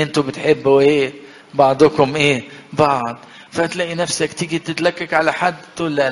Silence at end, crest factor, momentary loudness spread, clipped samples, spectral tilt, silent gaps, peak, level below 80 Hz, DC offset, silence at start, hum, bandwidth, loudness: 0 s; 16 dB; 11 LU; under 0.1%; -4.5 dB/octave; none; 0 dBFS; -54 dBFS; under 0.1%; 0 s; none; 11.5 kHz; -17 LUFS